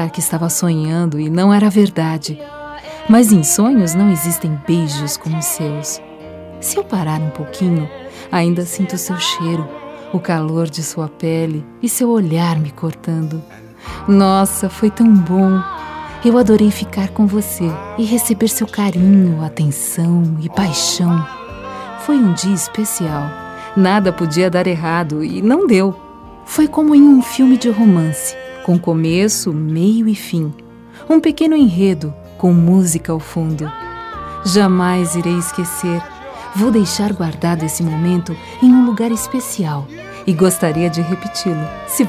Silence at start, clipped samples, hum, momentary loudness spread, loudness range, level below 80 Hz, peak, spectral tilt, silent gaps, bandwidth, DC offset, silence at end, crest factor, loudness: 0 s; under 0.1%; none; 14 LU; 6 LU; -44 dBFS; 0 dBFS; -5.5 dB/octave; none; 16 kHz; under 0.1%; 0 s; 14 dB; -15 LUFS